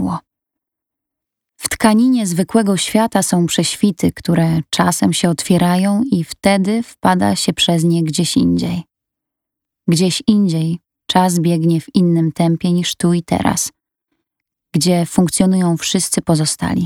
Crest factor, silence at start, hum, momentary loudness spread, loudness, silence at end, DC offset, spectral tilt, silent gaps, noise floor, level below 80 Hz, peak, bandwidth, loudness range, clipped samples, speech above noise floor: 16 dB; 0 s; none; 5 LU; -15 LUFS; 0 s; under 0.1%; -5 dB/octave; none; -82 dBFS; -48 dBFS; 0 dBFS; 16.5 kHz; 2 LU; under 0.1%; 68 dB